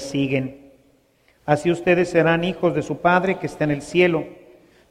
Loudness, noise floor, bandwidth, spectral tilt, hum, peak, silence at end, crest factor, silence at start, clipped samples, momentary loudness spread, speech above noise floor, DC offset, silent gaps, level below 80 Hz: -20 LUFS; -59 dBFS; 11.5 kHz; -6.5 dB/octave; none; -4 dBFS; 0.55 s; 18 dB; 0 s; under 0.1%; 8 LU; 40 dB; under 0.1%; none; -54 dBFS